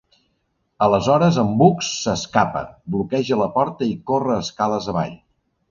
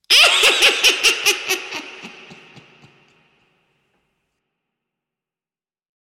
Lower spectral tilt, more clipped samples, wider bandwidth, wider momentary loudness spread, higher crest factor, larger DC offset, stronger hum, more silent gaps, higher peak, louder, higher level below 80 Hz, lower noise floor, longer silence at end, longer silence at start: first, -6 dB/octave vs 1.5 dB/octave; neither; second, 7.4 kHz vs 16.5 kHz; second, 9 LU vs 20 LU; about the same, 20 dB vs 20 dB; neither; neither; neither; about the same, 0 dBFS vs -2 dBFS; second, -20 LUFS vs -13 LUFS; first, -50 dBFS vs -62 dBFS; second, -70 dBFS vs under -90 dBFS; second, 0.55 s vs 4 s; first, 0.8 s vs 0.1 s